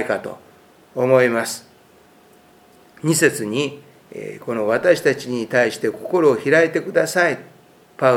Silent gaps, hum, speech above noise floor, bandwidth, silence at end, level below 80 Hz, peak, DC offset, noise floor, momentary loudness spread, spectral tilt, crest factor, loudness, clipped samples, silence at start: none; none; 32 dB; 16.5 kHz; 0 s; -66 dBFS; 0 dBFS; under 0.1%; -51 dBFS; 16 LU; -4.5 dB/octave; 20 dB; -19 LUFS; under 0.1%; 0 s